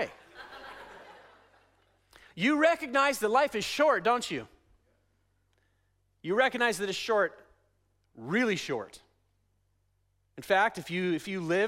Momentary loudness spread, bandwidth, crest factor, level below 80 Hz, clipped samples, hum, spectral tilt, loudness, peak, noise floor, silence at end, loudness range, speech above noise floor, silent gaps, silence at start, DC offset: 21 LU; 16 kHz; 20 dB; -68 dBFS; under 0.1%; none; -4 dB/octave; -28 LUFS; -12 dBFS; -73 dBFS; 0 s; 5 LU; 45 dB; none; 0 s; under 0.1%